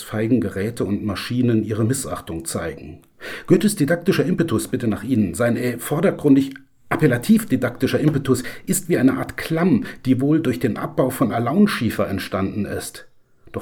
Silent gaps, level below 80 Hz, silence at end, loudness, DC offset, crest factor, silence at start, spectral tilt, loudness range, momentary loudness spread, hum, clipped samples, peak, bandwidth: none; -50 dBFS; 0 s; -20 LUFS; under 0.1%; 18 dB; 0 s; -6 dB/octave; 3 LU; 10 LU; none; under 0.1%; -2 dBFS; 19 kHz